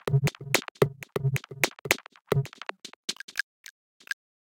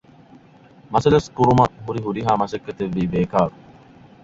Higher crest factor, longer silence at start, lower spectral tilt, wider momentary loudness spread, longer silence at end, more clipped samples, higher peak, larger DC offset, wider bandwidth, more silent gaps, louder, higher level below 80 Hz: first, 30 dB vs 20 dB; second, 0.05 s vs 0.9 s; second, -4.5 dB/octave vs -7.5 dB/octave; first, 13 LU vs 10 LU; first, 1.1 s vs 0.75 s; neither; about the same, 0 dBFS vs -2 dBFS; neither; first, 17 kHz vs 7.8 kHz; first, 0.71-0.75 s, 2.96-3.03 s, 3.24-3.28 s vs none; second, -30 LUFS vs -20 LUFS; second, -58 dBFS vs -46 dBFS